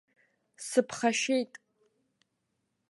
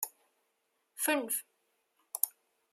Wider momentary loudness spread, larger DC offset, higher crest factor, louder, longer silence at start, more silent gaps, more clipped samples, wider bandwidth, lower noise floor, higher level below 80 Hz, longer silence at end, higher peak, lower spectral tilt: about the same, 13 LU vs 12 LU; neither; second, 22 dB vs 30 dB; first, -29 LUFS vs -34 LUFS; first, 0.6 s vs 0 s; neither; neither; second, 12 kHz vs 16 kHz; about the same, -80 dBFS vs -79 dBFS; first, -80 dBFS vs under -90 dBFS; first, 1.45 s vs 0.45 s; second, -12 dBFS vs -8 dBFS; first, -2.5 dB/octave vs 0 dB/octave